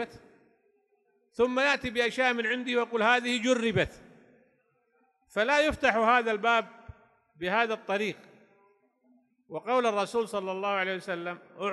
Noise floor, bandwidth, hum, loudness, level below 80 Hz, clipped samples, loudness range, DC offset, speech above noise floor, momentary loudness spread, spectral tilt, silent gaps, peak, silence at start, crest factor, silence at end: -71 dBFS; 12 kHz; none; -27 LUFS; -58 dBFS; under 0.1%; 5 LU; under 0.1%; 43 dB; 12 LU; -4 dB/octave; none; -8 dBFS; 0 s; 22 dB; 0 s